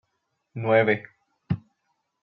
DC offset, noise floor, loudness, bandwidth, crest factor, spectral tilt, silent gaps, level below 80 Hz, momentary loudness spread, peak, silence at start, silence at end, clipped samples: under 0.1%; -77 dBFS; -25 LUFS; 5.6 kHz; 20 dB; -9.5 dB/octave; none; -64 dBFS; 12 LU; -8 dBFS; 0.55 s; 0.65 s; under 0.1%